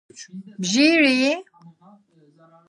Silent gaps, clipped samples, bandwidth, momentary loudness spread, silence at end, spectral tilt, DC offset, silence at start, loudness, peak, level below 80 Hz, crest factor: none; under 0.1%; 11 kHz; 23 LU; 1.25 s; -3.5 dB/octave; under 0.1%; 0.2 s; -18 LUFS; -4 dBFS; -78 dBFS; 18 dB